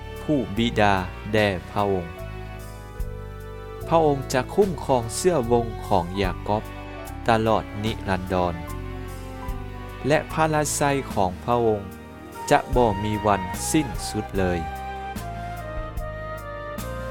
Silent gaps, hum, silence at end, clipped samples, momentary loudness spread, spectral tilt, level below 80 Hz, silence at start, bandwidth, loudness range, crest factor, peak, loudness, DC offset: none; none; 0 s; under 0.1%; 15 LU; -5 dB/octave; -38 dBFS; 0 s; 19 kHz; 4 LU; 22 dB; -4 dBFS; -24 LUFS; under 0.1%